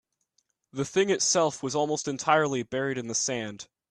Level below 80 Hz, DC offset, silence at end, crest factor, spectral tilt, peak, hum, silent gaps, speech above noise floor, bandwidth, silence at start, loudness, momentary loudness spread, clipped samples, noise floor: -68 dBFS; under 0.1%; 0.25 s; 22 dB; -3 dB/octave; -8 dBFS; none; none; 47 dB; 11 kHz; 0.75 s; -27 LUFS; 11 LU; under 0.1%; -74 dBFS